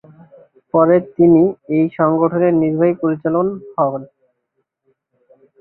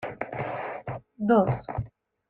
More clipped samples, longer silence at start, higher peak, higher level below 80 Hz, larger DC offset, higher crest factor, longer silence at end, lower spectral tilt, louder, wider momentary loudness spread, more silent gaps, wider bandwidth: neither; first, 0.75 s vs 0 s; first, -2 dBFS vs -10 dBFS; second, -58 dBFS vs -52 dBFS; neither; about the same, 16 dB vs 18 dB; first, 1.55 s vs 0.4 s; first, -14 dB/octave vs -10.5 dB/octave; first, -15 LUFS vs -28 LUFS; second, 8 LU vs 15 LU; neither; second, 3.1 kHz vs 4.4 kHz